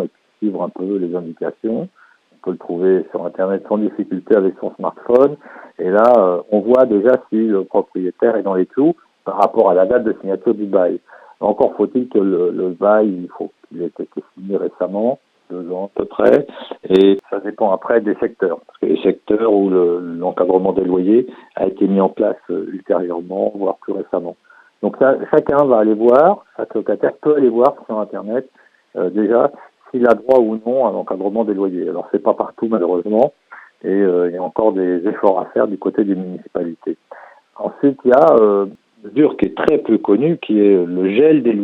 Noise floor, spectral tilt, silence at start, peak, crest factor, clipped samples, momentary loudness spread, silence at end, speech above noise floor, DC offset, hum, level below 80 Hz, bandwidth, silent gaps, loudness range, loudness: -48 dBFS; -9 dB/octave; 0 s; 0 dBFS; 16 dB; under 0.1%; 12 LU; 0 s; 32 dB; under 0.1%; none; -58 dBFS; 5 kHz; none; 5 LU; -16 LUFS